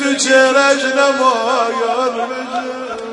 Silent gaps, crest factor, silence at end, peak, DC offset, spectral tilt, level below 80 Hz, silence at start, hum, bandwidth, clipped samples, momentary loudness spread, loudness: none; 14 dB; 0 s; 0 dBFS; under 0.1%; -1 dB/octave; -64 dBFS; 0 s; none; 11 kHz; under 0.1%; 12 LU; -14 LUFS